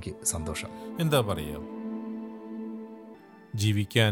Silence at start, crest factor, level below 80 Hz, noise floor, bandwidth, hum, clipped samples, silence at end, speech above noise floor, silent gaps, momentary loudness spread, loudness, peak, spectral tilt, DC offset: 0 s; 22 dB; -54 dBFS; -49 dBFS; 17 kHz; none; under 0.1%; 0 s; 22 dB; none; 17 LU; -31 LUFS; -8 dBFS; -4.5 dB/octave; under 0.1%